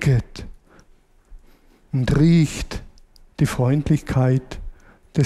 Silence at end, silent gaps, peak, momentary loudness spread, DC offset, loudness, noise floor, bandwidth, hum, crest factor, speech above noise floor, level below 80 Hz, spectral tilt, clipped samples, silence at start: 0 s; none; -6 dBFS; 22 LU; under 0.1%; -20 LUFS; -53 dBFS; 13.5 kHz; none; 16 dB; 35 dB; -36 dBFS; -7 dB/octave; under 0.1%; 0 s